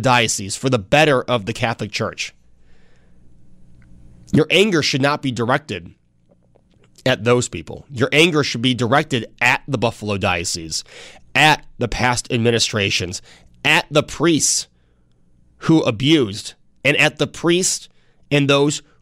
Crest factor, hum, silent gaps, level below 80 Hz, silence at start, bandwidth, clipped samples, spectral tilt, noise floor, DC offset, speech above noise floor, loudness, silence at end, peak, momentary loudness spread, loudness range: 16 dB; none; none; -46 dBFS; 0 s; 16 kHz; under 0.1%; -4 dB/octave; -56 dBFS; under 0.1%; 38 dB; -17 LUFS; 0.2 s; -2 dBFS; 12 LU; 4 LU